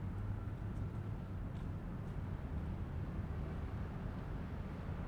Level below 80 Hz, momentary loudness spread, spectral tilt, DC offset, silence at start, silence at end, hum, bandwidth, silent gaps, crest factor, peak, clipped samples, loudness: -48 dBFS; 2 LU; -9 dB/octave; under 0.1%; 0 s; 0 s; none; 8.8 kHz; none; 12 dB; -30 dBFS; under 0.1%; -44 LUFS